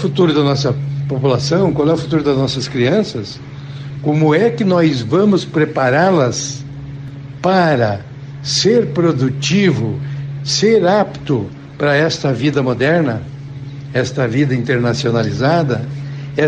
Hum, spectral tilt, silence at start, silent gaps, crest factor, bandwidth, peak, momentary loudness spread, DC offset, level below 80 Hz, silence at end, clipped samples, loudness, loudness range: none; -6 dB/octave; 0 s; none; 12 dB; 9.4 kHz; -2 dBFS; 15 LU; under 0.1%; -46 dBFS; 0 s; under 0.1%; -15 LUFS; 2 LU